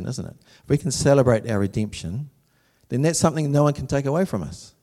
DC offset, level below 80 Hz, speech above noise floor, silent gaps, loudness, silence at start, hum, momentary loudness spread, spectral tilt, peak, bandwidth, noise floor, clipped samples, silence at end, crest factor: under 0.1%; -48 dBFS; 40 dB; none; -22 LUFS; 0 s; none; 15 LU; -6 dB/octave; -4 dBFS; 14 kHz; -62 dBFS; under 0.1%; 0.15 s; 20 dB